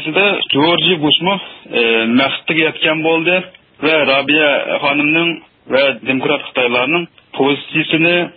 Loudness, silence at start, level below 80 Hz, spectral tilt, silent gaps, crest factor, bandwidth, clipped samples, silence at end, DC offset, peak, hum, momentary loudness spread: -13 LUFS; 0 s; -60 dBFS; -10 dB/octave; none; 14 dB; 4.9 kHz; under 0.1%; 0.05 s; under 0.1%; 0 dBFS; none; 7 LU